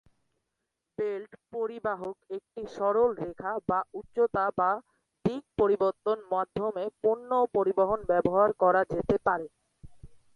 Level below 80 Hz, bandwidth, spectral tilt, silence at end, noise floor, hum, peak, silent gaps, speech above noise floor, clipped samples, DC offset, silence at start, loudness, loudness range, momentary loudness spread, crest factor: -60 dBFS; 7 kHz; -8 dB/octave; 0.2 s; -84 dBFS; none; -8 dBFS; none; 56 dB; under 0.1%; under 0.1%; 1 s; -29 LUFS; 5 LU; 12 LU; 20 dB